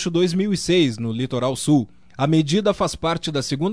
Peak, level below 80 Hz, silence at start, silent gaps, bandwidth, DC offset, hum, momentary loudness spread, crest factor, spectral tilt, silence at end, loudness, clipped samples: -6 dBFS; -48 dBFS; 0 s; none; 11 kHz; 0.4%; none; 6 LU; 14 dB; -5.5 dB/octave; 0 s; -21 LUFS; under 0.1%